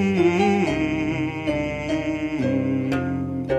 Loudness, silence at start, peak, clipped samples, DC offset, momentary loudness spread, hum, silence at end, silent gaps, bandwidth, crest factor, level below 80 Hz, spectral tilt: -23 LUFS; 0 s; -8 dBFS; under 0.1%; under 0.1%; 6 LU; none; 0 s; none; 11 kHz; 14 dB; -44 dBFS; -7 dB/octave